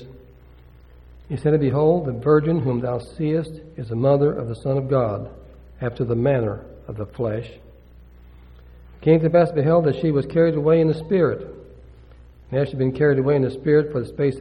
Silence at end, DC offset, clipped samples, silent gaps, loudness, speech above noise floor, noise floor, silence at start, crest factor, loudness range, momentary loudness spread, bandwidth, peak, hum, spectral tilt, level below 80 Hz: 0 s; under 0.1%; under 0.1%; none; -21 LUFS; 27 dB; -47 dBFS; 0 s; 18 dB; 7 LU; 14 LU; 9.8 kHz; -4 dBFS; none; -9.5 dB/octave; -46 dBFS